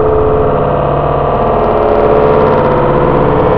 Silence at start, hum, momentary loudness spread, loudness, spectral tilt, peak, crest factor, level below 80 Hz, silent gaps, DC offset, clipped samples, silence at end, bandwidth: 0 s; none; 3 LU; -10 LUFS; -10.5 dB/octave; 0 dBFS; 10 dB; -24 dBFS; none; under 0.1%; 0.4%; 0 s; 5.4 kHz